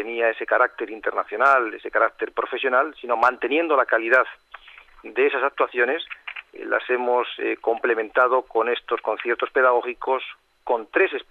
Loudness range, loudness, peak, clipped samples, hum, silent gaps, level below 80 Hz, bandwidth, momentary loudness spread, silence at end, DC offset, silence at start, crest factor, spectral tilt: 2 LU; -22 LUFS; -6 dBFS; under 0.1%; none; none; -66 dBFS; 7.8 kHz; 8 LU; 0.1 s; under 0.1%; 0 s; 18 dB; -4 dB/octave